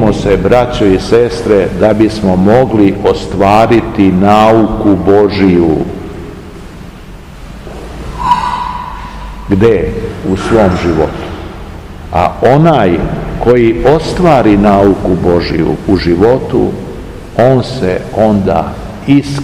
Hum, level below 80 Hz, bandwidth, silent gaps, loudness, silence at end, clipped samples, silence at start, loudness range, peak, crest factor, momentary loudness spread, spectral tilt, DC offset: none; -26 dBFS; 15 kHz; none; -9 LUFS; 0 s; 3%; 0 s; 7 LU; 0 dBFS; 10 dB; 19 LU; -7.5 dB/octave; 0.5%